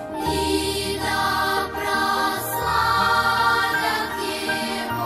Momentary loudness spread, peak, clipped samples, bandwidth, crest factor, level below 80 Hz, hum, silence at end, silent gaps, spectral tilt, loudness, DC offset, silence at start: 6 LU; -8 dBFS; under 0.1%; 16 kHz; 14 dB; -42 dBFS; none; 0 s; none; -3 dB/octave; -21 LUFS; under 0.1%; 0 s